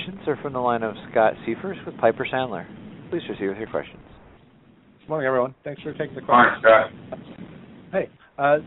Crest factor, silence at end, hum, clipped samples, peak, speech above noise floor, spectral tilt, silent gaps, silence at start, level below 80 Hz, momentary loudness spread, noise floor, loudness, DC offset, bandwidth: 20 dB; 0 s; none; under 0.1%; -2 dBFS; 31 dB; -3.5 dB/octave; none; 0 s; -58 dBFS; 22 LU; -54 dBFS; -23 LUFS; under 0.1%; 4.1 kHz